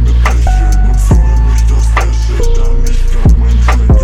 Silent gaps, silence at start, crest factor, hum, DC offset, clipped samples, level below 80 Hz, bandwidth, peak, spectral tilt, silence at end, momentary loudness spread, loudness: none; 0 s; 6 dB; none; under 0.1%; under 0.1%; -8 dBFS; 11 kHz; 0 dBFS; -6.5 dB/octave; 0 s; 5 LU; -11 LUFS